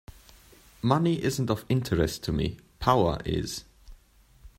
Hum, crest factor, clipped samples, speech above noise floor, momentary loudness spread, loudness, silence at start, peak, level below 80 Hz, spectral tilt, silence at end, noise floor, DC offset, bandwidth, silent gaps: none; 22 dB; under 0.1%; 32 dB; 8 LU; -27 LUFS; 0.85 s; -6 dBFS; -46 dBFS; -6 dB/octave; 0.1 s; -58 dBFS; under 0.1%; 16 kHz; none